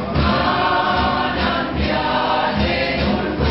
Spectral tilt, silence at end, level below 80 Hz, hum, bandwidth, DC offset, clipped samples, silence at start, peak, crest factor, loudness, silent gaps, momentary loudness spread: -8 dB/octave; 0 s; -30 dBFS; none; 6 kHz; 0.4%; under 0.1%; 0 s; -4 dBFS; 14 dB; -18 LUFS; none; 3 LU